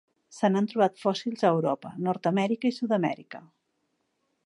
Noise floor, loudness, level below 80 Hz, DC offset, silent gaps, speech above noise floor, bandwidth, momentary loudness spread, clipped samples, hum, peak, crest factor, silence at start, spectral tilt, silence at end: -76 dBFS; -27 LUFS; -80 dBFS; under 0.1%; none; 50 dB; 11 kHz; 7 LU; under 0.1%; none; -10 dBFS; 18 dB; 0.3 s; -6.5 dB/octave; 1.05 s